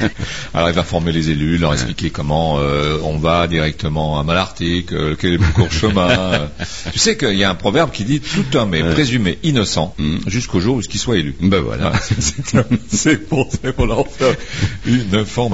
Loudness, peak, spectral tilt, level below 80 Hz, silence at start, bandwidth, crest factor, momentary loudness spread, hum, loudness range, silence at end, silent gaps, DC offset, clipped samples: -17 LUFS; -2 dBFS; -5 dB/octave; -30 dBFS; 0 s; 8 kHz; 16 dB; 5 LU; none; 2 LU; 0 s; none; 2%; under 0.1%